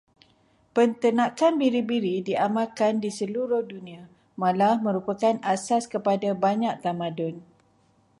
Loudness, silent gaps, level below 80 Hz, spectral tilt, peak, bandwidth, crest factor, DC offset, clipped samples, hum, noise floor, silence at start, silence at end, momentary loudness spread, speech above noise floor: -25 LUFS; none; -72 dBFS; -6 dB/octave; -10 dBFS; 11.5 kHz; 16 dB; under 0.1%; under 0.1%; none; -63 dBFS; 0.75 s; 0.8 s; 9 LU; 39 dB